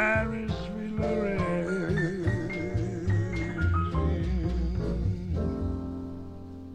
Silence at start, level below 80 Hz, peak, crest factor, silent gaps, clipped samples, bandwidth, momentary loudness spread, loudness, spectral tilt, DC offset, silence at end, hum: 0 s; -36 dBFS; -14 dBFS; 16 dB; none; under 0.1%; 9.2 kHz; 7 LU; -30 LUFS; -8 dB/octave; 0.2%; 0 s; none